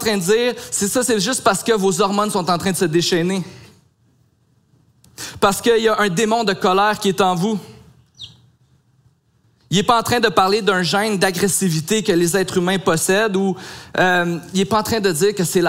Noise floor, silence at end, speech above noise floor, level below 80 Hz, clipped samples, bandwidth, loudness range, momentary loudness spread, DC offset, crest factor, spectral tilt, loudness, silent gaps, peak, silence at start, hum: -59 dBFS; 0 s; 42 dB; -54 dBFS; under 0.1%; 16 kHz; 5 LU; 7 LU; under 0.1%; 18 dB; -4 dB/octave; -17 LUFS; none; 0 dBFS; 0 s; none